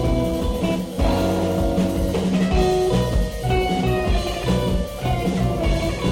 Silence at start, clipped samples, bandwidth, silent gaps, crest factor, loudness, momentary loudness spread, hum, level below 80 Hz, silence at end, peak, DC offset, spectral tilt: 0 s; under 0.1%; 16.5 kHz; none; 12 dB; -21 LUFS; 4 LU; none; -26 dBFS; 0 s; -8 dBFS; under 0.1%; -6.5 dB/octave